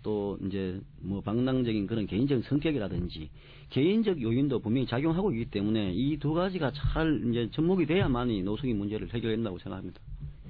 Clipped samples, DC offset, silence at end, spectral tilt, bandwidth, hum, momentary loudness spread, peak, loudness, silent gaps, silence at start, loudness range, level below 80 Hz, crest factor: under 0.1%; under 0.1%; 0 s; -10.5 dB/octave; 5.2 kHz; none; 10 LU; -14 dBFS; -30 LUFS; none; 0 s; 2 LU; -44 dBFS; 14 dB